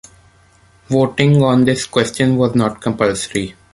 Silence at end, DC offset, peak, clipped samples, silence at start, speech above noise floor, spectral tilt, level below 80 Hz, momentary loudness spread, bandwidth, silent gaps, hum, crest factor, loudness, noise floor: 0.2 s; under 0.1%; 0 dBFS; under 0.1%; 0.9 s; 36 dB; -6 dB/octave; -46 dBFS; 8 LU; 11.5 kHz; none; none; 16 dB; -15 LUFS; -50 dBFS